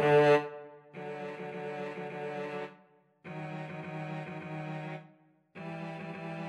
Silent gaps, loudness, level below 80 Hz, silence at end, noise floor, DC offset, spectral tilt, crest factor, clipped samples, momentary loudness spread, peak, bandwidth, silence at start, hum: none; -35 LUFS; -82 dBFS; 0 s; -63 dBFS; under 0.1%; -7 dB/octave; 22 dB; under 0.1%; 18 LU; -12 dBFS; 10.5 kHz; 0 s; none